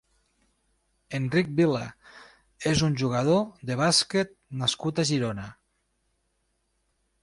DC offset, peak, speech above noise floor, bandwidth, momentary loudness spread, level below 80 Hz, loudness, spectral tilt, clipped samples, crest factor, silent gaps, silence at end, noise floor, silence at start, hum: under 0.1%; -10 dBFS; 48 dB; 11.5 kHz; 11 LU; -56 dBFS; -26 LUFS; -4.5 dB/octave; under 0.1%; 18 dB; none; 1.7 s; -74 dBFS; 1.1 s; none